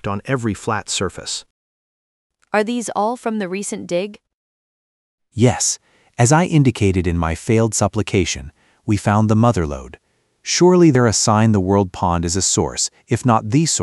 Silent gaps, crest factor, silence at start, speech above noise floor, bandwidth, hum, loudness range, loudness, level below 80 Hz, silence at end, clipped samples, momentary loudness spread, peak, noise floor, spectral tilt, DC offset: 1.50-2.30 s, 4.34-5.18 s; 16 dB; 0.05 s; over 73 dB; 12 kHz; none; 8 LU; -17 LUFS; -40 dBFS; 0 s; under 0.1%; 12 LU; 0 dBFS; under -90 dBFS; -5 dB/octave; under 0.1%